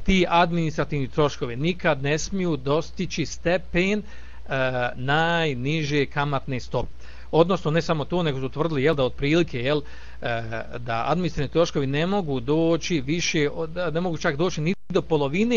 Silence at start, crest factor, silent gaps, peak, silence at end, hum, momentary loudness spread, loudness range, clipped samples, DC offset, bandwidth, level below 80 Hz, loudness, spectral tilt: 0 s; 20 dB; none; -4 dBFS; 0 s; none; 8 LU; 2 LU; under 0.1%; 2%; 7.6 kHz; -42 dBFS; -24 LUFS; -5.5 dB/octave